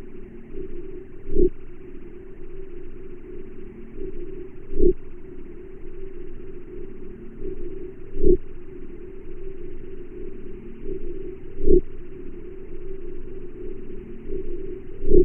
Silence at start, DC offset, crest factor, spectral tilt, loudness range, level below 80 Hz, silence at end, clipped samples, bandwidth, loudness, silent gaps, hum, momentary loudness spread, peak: 0 s; under 0.1%; 22 dB; -12 dB/octave; 8 LU; -28 dBFS; 0 s; under 0.1%; 2.7 kHz; -31 LUFS; none; none; 19 LU; -2 dBFS